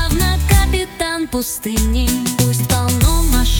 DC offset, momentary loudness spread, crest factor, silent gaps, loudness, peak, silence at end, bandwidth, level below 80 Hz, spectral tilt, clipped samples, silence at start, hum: under 0.1%; 6 LU; 14 dB; none; -16 LUFS; -2 dBFS; 0 s; 19.5 kHz; -18 dBFS; -4.5 dB/octave; under 0.1%; 0 s; none